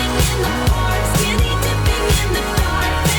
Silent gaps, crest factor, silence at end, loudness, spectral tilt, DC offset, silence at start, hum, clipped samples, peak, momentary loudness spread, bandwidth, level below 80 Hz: none; 10 dB; 0 s; -17 LUFS; -4 dB/octave; under 0.1%; 0 s; none; under 0.1%; -6 dBFS; 2 LU; over 20 kHz; -20 dBFS